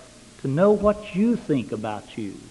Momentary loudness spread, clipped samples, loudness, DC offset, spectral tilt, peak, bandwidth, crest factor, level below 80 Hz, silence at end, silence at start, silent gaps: 15 LU; under 0.1%; -23 LUFS; under 0.1%; -7.5 dB/octave; -6 dBFS; 11.5 kHz; 18 dB; -50 dBFS; 0 s; 0 s; none